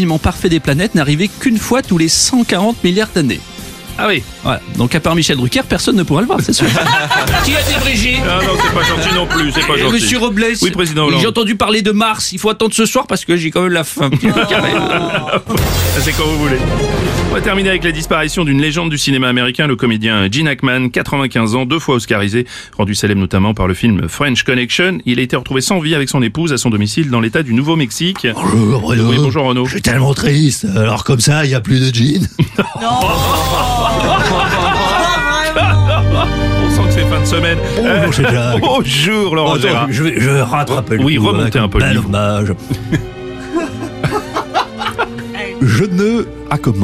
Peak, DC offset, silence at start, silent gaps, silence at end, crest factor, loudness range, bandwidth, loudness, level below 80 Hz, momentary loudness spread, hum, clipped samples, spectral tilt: 0 dBFS; under 0.1%; 0 s; none; 0 s; 12 dB; 3 LU; 15.5 kHz; -13 LUFS; -28 dBFS; 5 LU; none; under 0.1%; -4.5 dB/octave